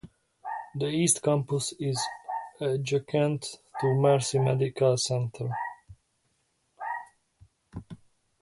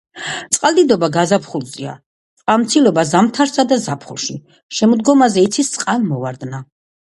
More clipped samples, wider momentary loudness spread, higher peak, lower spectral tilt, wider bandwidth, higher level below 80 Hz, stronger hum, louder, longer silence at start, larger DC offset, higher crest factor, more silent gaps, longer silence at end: neither; about the same, 15 LU vs 15 LU; second, -10 dBFS vs 0 dBFS; about the same, -5 dB/octave vs -4.5 dB/octave; about the same, 11.5 kHz vs 11.5 kHz; about the same, -64 dBFS vs -60 dBFS; neither; second, -28 LUFS vs -15 LUFS; about the same, 0.05 s vs 0.15 s; neither; about the same, 20 dB vs 16 dB; second, none vs 2.06-2.37 s, 4.63-4.69 s; about the same, 0.45 s vs 0.4 s